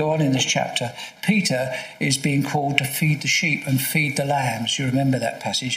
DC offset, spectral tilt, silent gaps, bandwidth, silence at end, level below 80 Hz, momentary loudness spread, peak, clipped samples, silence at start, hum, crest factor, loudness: under 0.1%; -4 dB/octave; none; 16 kHz; 0 s; -62 dBFS; 6 LU; 0 dBFS; under 0.1%; 0 s; none; 22 dB; -21 LUFS